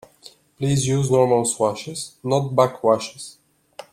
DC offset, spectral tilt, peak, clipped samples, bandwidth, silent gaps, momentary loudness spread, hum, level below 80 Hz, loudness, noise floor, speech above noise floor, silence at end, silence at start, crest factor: under 0.1%; -5.5 dB/octave; -2 dBFS; under 0.1%; 15 kHz; none; 14 LU; none; -56 dBFS; -20 LUFS; -49 dBFS; 29 dB; 0.1 s; 0.25 s; 20 dB